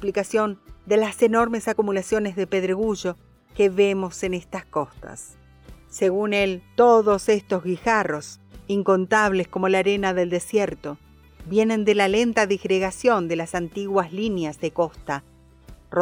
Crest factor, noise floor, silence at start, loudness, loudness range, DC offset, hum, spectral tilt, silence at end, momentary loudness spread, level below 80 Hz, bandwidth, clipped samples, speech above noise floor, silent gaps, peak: 16 dB; -47 dBFS; 0 s; -22 LUFS; 4 LU; under 0.1%; none; -5 dB/octave; 0 s; 13 LU; -50 dBFS; 16 kHz; under 0.1%; 26 dB; none; -6 dBFS